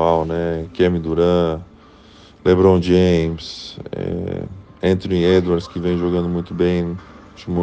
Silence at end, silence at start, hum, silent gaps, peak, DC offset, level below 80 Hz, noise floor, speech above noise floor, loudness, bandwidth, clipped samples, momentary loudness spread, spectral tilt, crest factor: 0 s; 0 s; none; none; -2 dBFS; under 0.1%; -44 dBFS; -45 dBFS; 27 dB; -18 LUFS; 8.2 kHz; under 0.1%; 15 LU; -7.5 dB/octave; 18 dB